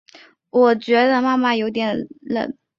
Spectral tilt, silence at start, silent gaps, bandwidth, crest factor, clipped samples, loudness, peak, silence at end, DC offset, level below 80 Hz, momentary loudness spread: -6 dB/octave; 0.55 s; none; 7.2 kHz; 16 dB; under 0.1%; -19 LUFS; -4 dBFS; 0.25 s; under 0.1%; -64 dBFS; 9 LU